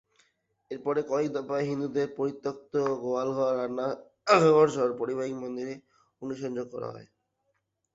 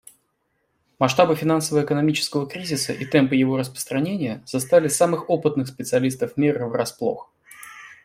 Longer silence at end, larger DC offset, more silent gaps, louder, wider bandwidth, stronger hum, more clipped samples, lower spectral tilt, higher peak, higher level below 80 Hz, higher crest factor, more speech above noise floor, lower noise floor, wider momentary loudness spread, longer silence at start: first, 0.9 s vs 0.1 s; neither; neither; second, -28 LUFS vs -22 LUFS; second, 8 kHz vs 16 kHz; neither; neither; about the same, -6 dB/octave vs -5 dB/octave; second, -8 dBFS vs -2 dBFS; second, -72 dBFS vs -62 dBFS; about the same, 22 dB vs 20 dB; about the same, 50 dB vs 50 dB; first, -78 dBFS vs -71 dBFS; first, 17 LU vs 9 LU; second, 0.7 s vs 1 s